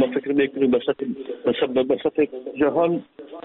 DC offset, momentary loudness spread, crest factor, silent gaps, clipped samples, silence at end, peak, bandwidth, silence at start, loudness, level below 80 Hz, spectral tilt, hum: under 0.1%; 8 LU; 14 dB; none; under 0.1%; 0.05 s; -8 dBFS; 4.1 kHz; 0 s; -22 LUFS; -60 dBFS; -4.5 dB/octave; none